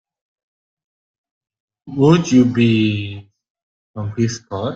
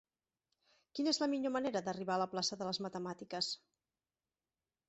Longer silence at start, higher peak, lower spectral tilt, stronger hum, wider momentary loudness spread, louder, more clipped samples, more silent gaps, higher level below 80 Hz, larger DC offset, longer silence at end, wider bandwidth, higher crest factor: first, 1.85 s vs 0.95 s; first, -2 dBFS vs -22 dBFS; first, -6.5 dB/octave vs -3.5 dB/octave; neither; first, 17 LU vs 9 LU; first, -16 LUFS vs -38 LUFS; neither; first, 3.50-3.55 s, 3.63-3.94 s vs none; first, -54 dBFS vs -80 dBFS; neither; second, 0 s vs 1.3 s; about the same, 7.8 kHz vs 8.2 kHz; about the same, 18 dB vs 20 dB